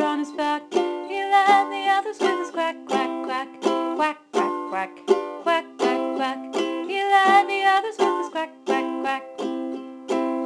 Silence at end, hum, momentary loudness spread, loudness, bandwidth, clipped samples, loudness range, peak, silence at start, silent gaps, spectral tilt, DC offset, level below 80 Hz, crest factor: 0 s; none; 11 LU; -23 LUFS; 12 kHz; under 0.1%; 4 LU; -4 dBFS; 0 s; none; -3 dB/octave; under 0.1%; -74 dBFS; 18 dB